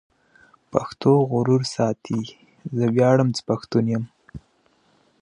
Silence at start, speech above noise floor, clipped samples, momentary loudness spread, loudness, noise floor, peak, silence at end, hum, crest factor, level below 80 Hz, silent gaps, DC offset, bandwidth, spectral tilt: 0.75 s; 42 dB; under 0.1%; 12 LU; -22 LUFS; -62 dBFS; 0 dBFS; 0.85 s; none; 22 dB; -58 dBFS; none; under 0.1%; 10.5 kHz; -7 dB/octave